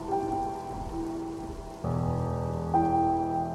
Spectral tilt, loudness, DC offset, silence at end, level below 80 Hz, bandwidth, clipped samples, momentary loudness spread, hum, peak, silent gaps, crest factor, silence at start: -8.5 dB/octave; -30 LUFS; under 0.1%; 0 s; -46 dBFS; 13 kHz; under 0.1%; 11 LU; none; -14 dBFS; none; 16 dB; 0 s